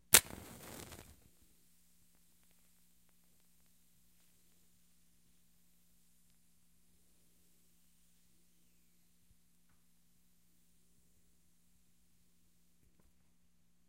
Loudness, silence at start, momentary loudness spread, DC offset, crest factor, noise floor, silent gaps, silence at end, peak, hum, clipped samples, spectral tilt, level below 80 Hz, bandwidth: -27 LUFS; 0.15 s; 27 LU; under 0.1%; 46 dB; -76 dBFS; none; 13.7 s; 0 dBFS; none; under 0.1%; 0 dB/octave; -68 dBFS; 16 kHz